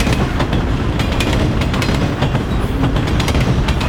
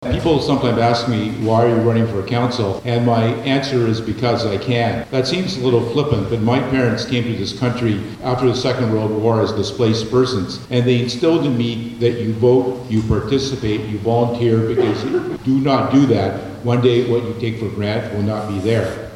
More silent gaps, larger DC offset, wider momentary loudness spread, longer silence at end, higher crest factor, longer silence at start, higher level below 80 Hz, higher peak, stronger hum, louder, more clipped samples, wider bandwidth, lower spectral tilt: neither; neither; second, 2 LU vs 6 LU; about the same, 0 s vs 0 s; about the same, 14 dB vs 16 dB; about the same, 0 s vs 0 s; first, -20 dBFS vs -42 dBFS; about the same, -2 dBFS vs -2 dBFS; neither; about the same, -17 LUFS vs -18 LUFS; neither; first, 17.5 kHz vs 11.5 kHz; about the same, -6 dB/octave vs -7 dB/octave